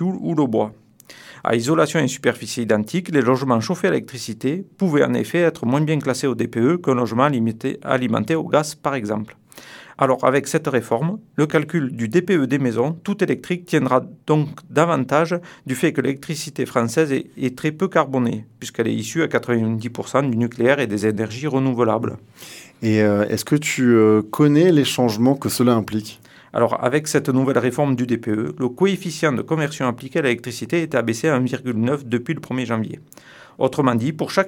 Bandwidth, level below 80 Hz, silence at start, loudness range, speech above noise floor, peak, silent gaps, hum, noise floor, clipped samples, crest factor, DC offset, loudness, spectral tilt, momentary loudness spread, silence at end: 18 kHz; -64 dBFS; 0 s; 4 LU; 25 dB; 0 dBFS; none; none; -45 dBFS; under 0.1%; 20 dB; under 0.1%; -20 LUFS; -6 dB/octave; 8 LU; 0 s